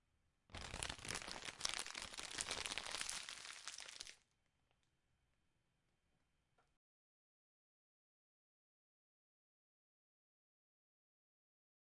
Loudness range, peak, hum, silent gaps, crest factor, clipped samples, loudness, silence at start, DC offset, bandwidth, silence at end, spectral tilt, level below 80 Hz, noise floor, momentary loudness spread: 13 LU; -16 dBFS; none; none; 38 dB; under 0.1%; -47 LUFS; 0.5 s; under 0.1%; 12 kHz; 7.8 s; -0.5 dB/octave; -70 dBFS; -84 dBFS; 9 LU